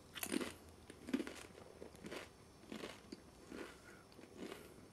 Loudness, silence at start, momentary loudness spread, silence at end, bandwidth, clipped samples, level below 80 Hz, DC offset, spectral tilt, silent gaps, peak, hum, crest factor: -50 LUFS; 0 s; 15 LU; 0 s; 15.5 kHz; under 0.1%; -72 dBFS; under 0.1%; -3.5 dB/octave; none; -24 dBFS; none; 26 dB